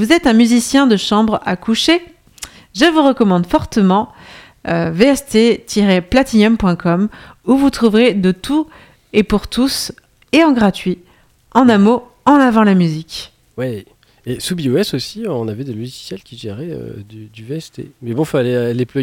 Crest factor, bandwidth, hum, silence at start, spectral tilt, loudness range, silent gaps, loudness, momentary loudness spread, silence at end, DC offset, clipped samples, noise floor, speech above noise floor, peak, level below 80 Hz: 14 dB; 16.5 kHz; none; 0 s; -5.5 dB/octave; 8 LU; none; -14 LUFS; 17 LU; 0 s; under 0.1%; under 0.1%; -50 dBFS; 36 dB; 0 dBFS; -40 dBFS